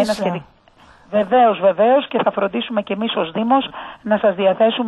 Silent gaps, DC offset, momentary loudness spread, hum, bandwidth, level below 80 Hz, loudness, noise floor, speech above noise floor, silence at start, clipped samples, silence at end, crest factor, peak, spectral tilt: none; under 0.1%; 9 LU; none; 12 kHz; -58 dBFS; -17 LUFS; -49 dBFS; 32 dB; 0 s; under 0.1%; 0 s; 14 dB; -4 dBFS; -6 dB/octave